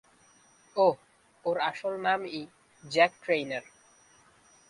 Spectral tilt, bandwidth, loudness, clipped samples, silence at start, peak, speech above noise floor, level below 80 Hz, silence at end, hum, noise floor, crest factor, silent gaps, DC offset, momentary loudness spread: -4.5 dB/octave; 11.5 kHz; -29 LUFS; under 0.1%; 0.75 s; -8 dBFS; 33 dB; -76 dBFS; 1.1 s; none; -61 dBFS; 22 dB; none; under 0.1%; 14 LU